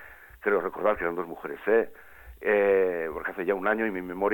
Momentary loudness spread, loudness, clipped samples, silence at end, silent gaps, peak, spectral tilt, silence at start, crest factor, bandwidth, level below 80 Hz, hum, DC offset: 10 LU; -27 LUFS; under 0.1%; 0 s; none; -10 dBFS; -7 dB/octave; 0 s; 16 dB; 17.5 kHz; -56 dBFS; none; under 0.1%